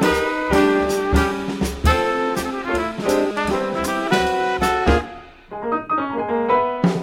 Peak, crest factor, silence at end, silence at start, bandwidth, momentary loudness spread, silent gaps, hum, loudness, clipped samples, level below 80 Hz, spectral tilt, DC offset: -2 dBFS; 18 dB; 0 s; 0 s; 16.5 kHz; 7 LU; none; none; -20 LUFS; under 0.1%; -30 dBFS; -5.5 dB/octave; under 0.1%